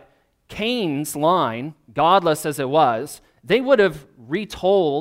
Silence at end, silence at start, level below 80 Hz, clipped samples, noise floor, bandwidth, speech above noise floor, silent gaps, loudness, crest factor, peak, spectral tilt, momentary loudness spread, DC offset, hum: 0 s; 0.5 s; -54 dBFS; under 0.1%; -56 dBFS; 16 kHz; 37 dB; none; -20 LUFS; 18 dB; -2 dBFS; -5 dB/octave; 14 LU; under 0.1%; none